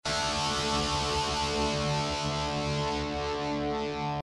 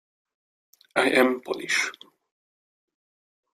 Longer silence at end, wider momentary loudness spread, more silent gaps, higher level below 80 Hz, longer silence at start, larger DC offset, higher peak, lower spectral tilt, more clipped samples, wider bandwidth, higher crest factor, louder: second, 0 s vs 1.6 s; second, 4 LU vs 10 LU; neither; first, -44 dBFS vs -72 dBFS; second, 0.05 s vs 0.95 s; neither; second, -18 dBFS vs -6 dBFS; first, -4 dB/octave vs -2.5 dB/octave; neither; second, 11.5 kHz vs 15.5 kHz; second, 12 dB vs 24 dB; second, -29 LUFS vs -24 LUFS